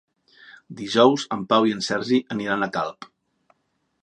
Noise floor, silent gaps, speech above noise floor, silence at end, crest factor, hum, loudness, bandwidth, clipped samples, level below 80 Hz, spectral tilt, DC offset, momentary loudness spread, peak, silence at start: -72 dBFS; none; 50 dB; 0.95 s; 22 dB; none; -22 LUFS; 10.5 kHz; under 0.1%; -66 dBFS; -4.5 dB/octave; under 0.1%; 12 LU; -2 dBFS; 0.5 s